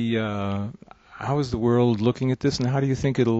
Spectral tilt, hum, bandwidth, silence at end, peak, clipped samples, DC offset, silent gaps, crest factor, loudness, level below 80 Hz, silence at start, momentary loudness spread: -7 dB/octave; none; 8 kHz; 0 s; -8 dBFS; under 0.1%; under 0.1%; none; 16 dB; -24 LUFS; -48 dBFS; 0 s; 9 LU